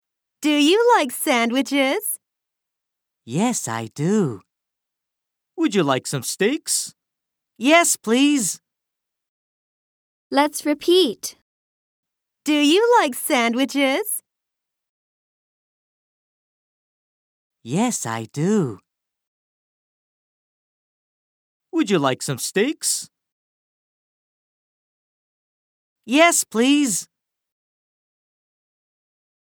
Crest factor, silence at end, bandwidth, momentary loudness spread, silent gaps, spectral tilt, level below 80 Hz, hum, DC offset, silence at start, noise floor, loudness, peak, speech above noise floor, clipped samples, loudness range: 20 dB; 2.5 s; over 20 kHz; 12 LU; 9.28-10.31 s, 11.42-12.03 s, 14.89-17.50 s, 19.27-21.60 s, 23.32-25.96 s; -3.5 dB/octave; -78 dBFS; none; under 0.1%; 0.4 s; -83 dBFS; -19 LUFS; -4 dBFS; 64 dB; under 0.1%; 8 LU